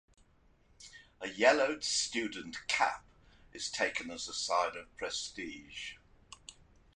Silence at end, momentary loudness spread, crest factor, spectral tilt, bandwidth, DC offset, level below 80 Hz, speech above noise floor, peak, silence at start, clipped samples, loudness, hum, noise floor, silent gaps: 0.45 s; 23 LU; 24 dB; -1 dB/octave; 11 kHz; under 0.1%; -66 dBFS; 32 dB; -12 dBFS; 0.8 s; under 0.1%; -34 LUFS; none; -67 dBFS; none